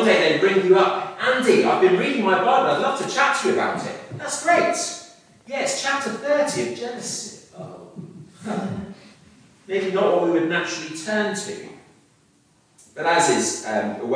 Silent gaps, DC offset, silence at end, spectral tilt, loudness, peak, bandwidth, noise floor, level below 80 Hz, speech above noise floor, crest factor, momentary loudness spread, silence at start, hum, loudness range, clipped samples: none; under 0.1%; 0 s; -3.5 dB/octave; -21 LUFS; -4 dBFS; 10.5 kHz; -59 dBFS; -68 dBFS; 39 dB; 18 dB; 19 LU; 0 s; none; 9 LU; under 0.1%